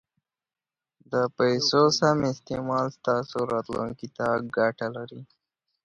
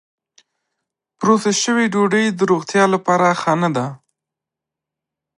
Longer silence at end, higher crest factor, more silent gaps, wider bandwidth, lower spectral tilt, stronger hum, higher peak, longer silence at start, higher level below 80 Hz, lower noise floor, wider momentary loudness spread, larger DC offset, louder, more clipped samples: second, 0.6 s vs 1.45 s; about the same, 20 dB vs 18 dB; neither; about the same, 10.5 kHz vs 11 kHz; about the same, -5 dB/octave vs -4.5 dB/octave; neither; second, -8 dBFS vs -2 dBFS; about the same, 1.1 s vs 1.2 s; first, -62 dBFS vs -68 dBFS; first, under -90 dBFS vs -85 dBFS; first, 13 LU vs 5 LU; neither; second, -26 LUFS vs -16 LUFS; neither